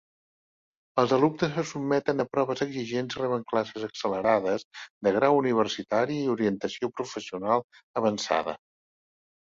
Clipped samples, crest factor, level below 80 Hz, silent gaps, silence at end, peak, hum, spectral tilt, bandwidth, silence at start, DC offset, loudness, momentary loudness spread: under 0.1%; 22 dB; -66 dBFS; 4.65-4.71 s, 4.90-5.01 s, 7.64-7.70 s, 7.83-7.94 s; 0.9 s; -6 dBFS; none; -5.5 dB/octave; 7.6 kHz; 0.95 s; under 0.1%; -27 LUFS; 10 LU